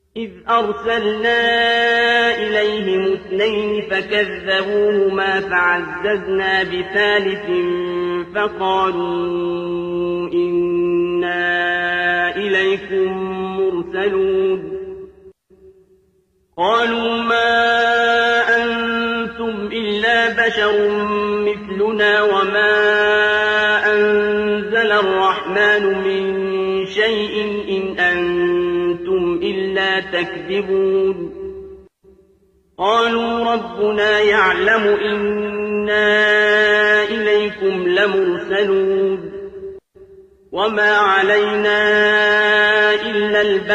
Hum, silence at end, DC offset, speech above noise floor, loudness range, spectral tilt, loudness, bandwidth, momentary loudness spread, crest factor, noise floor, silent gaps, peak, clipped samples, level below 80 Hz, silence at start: none; 0 s; under 0.1%; 44 dB; 5 LU; -5 dB/octave; -16 LUFS; 8.4 kHz; 8 LU; 14 dB; -60 dBFS; none; -4 dBFS; under 0.1%; -50 dBFS; 0.15 s